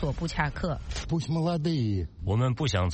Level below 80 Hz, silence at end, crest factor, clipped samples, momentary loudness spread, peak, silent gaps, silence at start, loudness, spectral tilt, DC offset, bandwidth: -40 dBFS; 0 s; 16 dB; under 0.1%; 6 LU; -12 dBFS; none; 0 s; -29 LUFS; -6.5 dB/octave; under 0.1%; 8.4 kHz